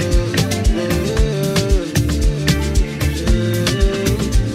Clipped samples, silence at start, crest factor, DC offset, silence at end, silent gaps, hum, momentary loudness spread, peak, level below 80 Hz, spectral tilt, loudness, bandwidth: under 0.1%; 0 s; 14 dB; under 0.1%; 0 s; none; none; 2 LU; -2 dBFS; -20 dBFS; -5.5 dB/octave; -18 LUFS; 16 kHz